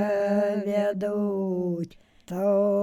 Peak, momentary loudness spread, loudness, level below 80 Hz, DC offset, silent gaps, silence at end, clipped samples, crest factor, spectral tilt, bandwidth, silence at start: -12 dBFS; 9 LU; -26 LUFS; -66 dBFS; under 0.1%; none; 0 s; under 0.1%; 12 dB; -8 dB/octave; 14.5 kHz; 0 s